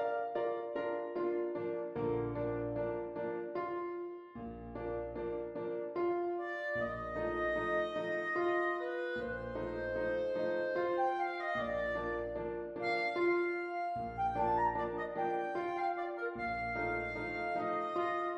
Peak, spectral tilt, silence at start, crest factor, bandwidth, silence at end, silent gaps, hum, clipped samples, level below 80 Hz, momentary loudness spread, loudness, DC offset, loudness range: -22 dBFS; -7.5 dB/octave; 0 s; 14 dB; 8 kHz; 0 s; none; none; under 0.1%; -58 dBFS; 7 LU; -37 LUFS; under 0.1%; 4 LU